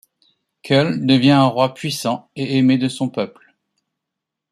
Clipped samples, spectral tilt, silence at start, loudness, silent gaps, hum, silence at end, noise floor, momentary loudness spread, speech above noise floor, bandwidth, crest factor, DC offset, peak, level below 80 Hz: under 0.1%; -6 dB/octave; 0.65 s; -17 LUFS; none; none; 1.25 s; -82 dBFS; 11 LU; 65 dB; 14 kHz; 16 dB; under 0.1%; -2 dBFS; -60 dBFS